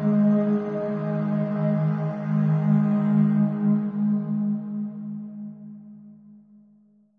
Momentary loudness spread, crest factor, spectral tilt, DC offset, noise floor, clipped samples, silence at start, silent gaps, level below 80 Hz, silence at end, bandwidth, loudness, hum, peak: 15 LU; 14 dB; -12 dB/octave; under 0.1%; -58 dBFS; under 0.1%; 0 s; none; -70 dBFS; 0.85 s; 3.5 kHz; -24 LUFS; none; -10 dBFS